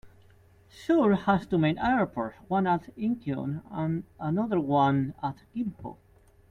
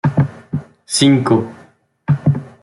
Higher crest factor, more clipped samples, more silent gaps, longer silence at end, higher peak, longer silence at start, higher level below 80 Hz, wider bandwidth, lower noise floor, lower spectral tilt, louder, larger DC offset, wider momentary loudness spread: about the same, 18 dB vs 14 dB; neither; neither; first, 0.55 s vs 0.15 s; second, -10 dBFS vs -2 dBFS; about the same, 0.05 s vs 0.05 s; second, -58 dBFS vs -52 dBFS; second, 10 kHz vs 12 kHz; first, -58 dBFS vs -48 dBFS; first, -8.5 dB/octave vs -5.5 dB/octave; second, -28 LUFS vs -16 LUFS; neither; second, 11 LU vs 14 LU